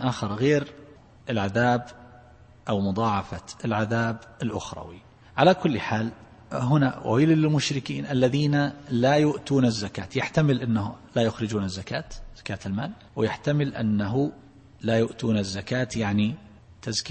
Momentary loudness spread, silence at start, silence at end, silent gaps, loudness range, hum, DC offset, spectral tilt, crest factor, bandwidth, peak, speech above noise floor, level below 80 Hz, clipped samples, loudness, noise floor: 13 LU; 0 s; 0 s; none; 5 LU; none; under 0.1%; -6 dB/octave; 20 dB; 8.8 kHz; -6 dBFS; 26 dB; -52 dBFS; under 0.1%; -25 LUFS; -51 dBFS